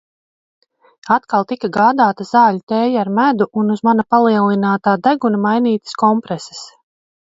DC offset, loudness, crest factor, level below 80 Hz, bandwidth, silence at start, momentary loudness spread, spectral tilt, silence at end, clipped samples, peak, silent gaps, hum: under 0.1%; -15 LUFS; 16 dB; -62 dBFS; 7.8 kHz; 1.05 s; 6 LU; -6.5 dB/octave; 0.7 s; under 0.1%; 0 dBFS; 2.63-2.67 s; none